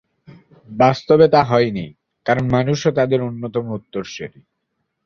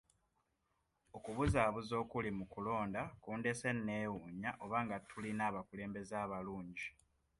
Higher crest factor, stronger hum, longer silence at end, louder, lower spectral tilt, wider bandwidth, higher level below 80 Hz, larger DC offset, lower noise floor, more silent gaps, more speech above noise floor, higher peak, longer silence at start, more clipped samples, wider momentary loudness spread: about the same, 18 dB vs 20 dB; neither; first, 0.8 s vs 0.5 s; first, -17 LUFS vs -41 LUFS; about the same, -6.5 dB/octave vs -6 dB/octave; second, 7 kHz vs 11.5 kHz; first, -50 dBFS vs -58 dBFS; neither; second, -74 dBFS vs -83 dBFS; neither; first, 57 dB vs 42 dB; first, 0 dBFS vs -20 dBFS; second, 0.7 s vs 1.15 s; neither; first, 18 LU vs 10 LU